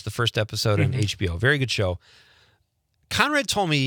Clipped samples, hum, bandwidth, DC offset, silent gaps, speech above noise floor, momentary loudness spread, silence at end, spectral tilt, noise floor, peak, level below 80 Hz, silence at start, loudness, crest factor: under 0.1%; none; 19.5 kHz; under 0.1%; none; 46 dB; 6 LU; 0 s; -4.5 dB/octave; -69 dBFS; -2 dBFS; -52 dBFS; 0.05 s; -23 LUFS; 22 dB